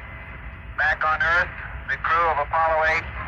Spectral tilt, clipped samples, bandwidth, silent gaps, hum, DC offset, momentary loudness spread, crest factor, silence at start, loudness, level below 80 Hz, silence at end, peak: -5 dB/octave; under 0.1%; 8.4 kHz; none; none; under 0.1%; 18 LU; 14 dB; 0 s; -21 LUFS; -40 dBFS; 0 s; -10 dBFS